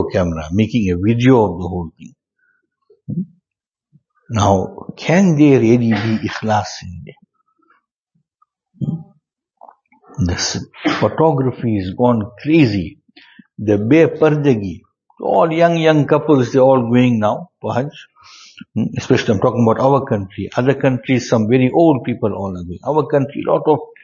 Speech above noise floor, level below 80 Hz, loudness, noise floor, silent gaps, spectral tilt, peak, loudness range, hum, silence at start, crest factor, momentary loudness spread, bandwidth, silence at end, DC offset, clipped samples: 71 dB; -46 dBFS; -16 LUFS; -86 dBFS; 7.91-7.95 s; -7 dB/octave; 0 dBFS; 10 LU; none; 0 s; 16 dB; 14 LU; 7.4 kHz; 0.2 s; under 0.1%; under 0.1%